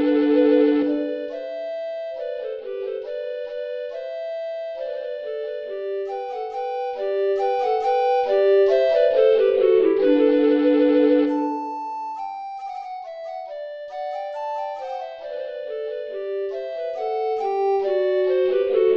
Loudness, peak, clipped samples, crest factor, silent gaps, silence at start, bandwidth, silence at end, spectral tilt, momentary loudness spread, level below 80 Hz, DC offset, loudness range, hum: -22 LUFS; -6 dBFS; under 0.1%; 14 dB; none; 0 s; 6.6 kHz; 0 s; -5.5 dB/octave; 14 LU; -64 dBFS; under 0.1%; 13 LU; none